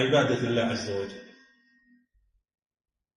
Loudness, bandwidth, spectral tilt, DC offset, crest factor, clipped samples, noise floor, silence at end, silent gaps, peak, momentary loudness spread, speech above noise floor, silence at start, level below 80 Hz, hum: -27 LUFS; 10 kHz; -5.5 dB/octave; under 0.1%; 20 dB; under 0.1%; -70 dBFS; 1.9 s; none; -10 dBFS; 15 LU; 44 dB; 0 s; -66 dBFS; none